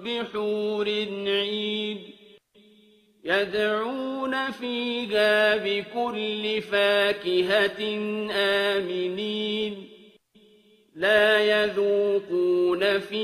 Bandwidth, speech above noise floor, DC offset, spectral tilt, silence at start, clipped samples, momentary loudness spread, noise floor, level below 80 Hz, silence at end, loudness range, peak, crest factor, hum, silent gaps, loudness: 14 kHz; 34 dB; under 0.1%; -4.5 dB/octave; 0 s; under 0.1%; 9 LU; -58 dBFS; -68 dBFS; 0 s; 5 LU; -6 dBFS; 18 dB; none; none; -24 LUFS